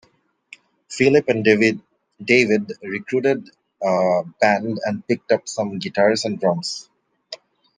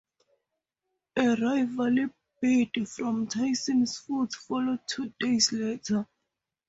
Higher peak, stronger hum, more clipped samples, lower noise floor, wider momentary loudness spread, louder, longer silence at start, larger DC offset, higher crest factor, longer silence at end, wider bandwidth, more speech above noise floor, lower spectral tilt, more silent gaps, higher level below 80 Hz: first, -2 dBFS vs -12 dBFS; neither; neither; second, -49 dBFS vs -84 dBFS; first, 17 LU vs 7 LU; first, -20 LUFS vs -28 LUFS; second, 0.9 s vs 1.15 s; neither; about the same, 20 dB vs 18 dB; second, 0.4 s vs 0.65 s; first, 9.8 kHz vs 8 kHz; second, 30 dB vs 57 dB; first, -5 dB/octave vs -3.5 dB/octave; neither; about the same, -64 dBFS vs -68 dBFS